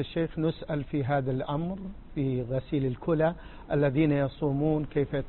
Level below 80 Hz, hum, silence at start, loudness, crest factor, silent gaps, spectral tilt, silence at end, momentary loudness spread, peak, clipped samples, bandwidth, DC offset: -48 dBFS; none; 0 s; -29 LUFS; 16 dB; none; -12 dB/octave; 0 s; 7 LU; -12 dBFS; under 0.1%; 4.3 kHz; under 0.1%